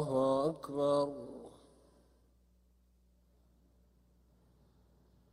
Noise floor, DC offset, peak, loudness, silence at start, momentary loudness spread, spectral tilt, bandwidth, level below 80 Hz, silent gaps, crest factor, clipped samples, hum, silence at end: -69 dBFS; under 0.1%; -20 dBFS; -33 LUFS; 0 s; 20 LU; -7 dB/octave; 11.5 kHz; -70 dBFS; none; 18 dB; under 0.1%; 60 Hz at -70 dBFS; 3.85 s